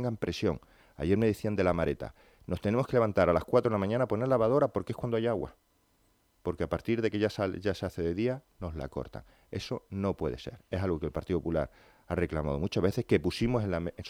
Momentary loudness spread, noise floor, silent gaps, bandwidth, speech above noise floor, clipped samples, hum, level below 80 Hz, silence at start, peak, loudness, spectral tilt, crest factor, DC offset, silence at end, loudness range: 13 LU; -69 dBFS; none; 16.5 kHz; 39 dB; under 0.1%; none; -52 dBFS; 0 s; -12 dBFS; -31 LUFS; -7.5 dB/octave; 20 dB; under 0.1%; 0 s; 7 LU